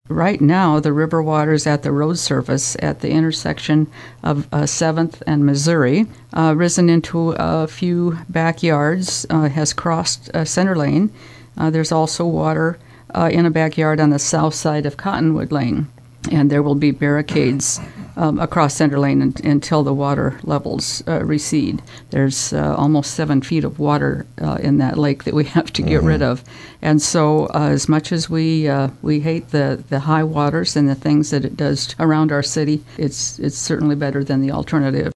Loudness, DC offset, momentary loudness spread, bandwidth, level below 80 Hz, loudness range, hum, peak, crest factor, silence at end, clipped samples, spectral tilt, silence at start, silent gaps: -17 LUFS; under 0.1%; 6 LU; 11 kHz; -42 dBFS; 2 LU; none; 0 dBFS; 16 dB; 0.05 s; under 0.1%; -5.5 dB/octave; 0.1 s; none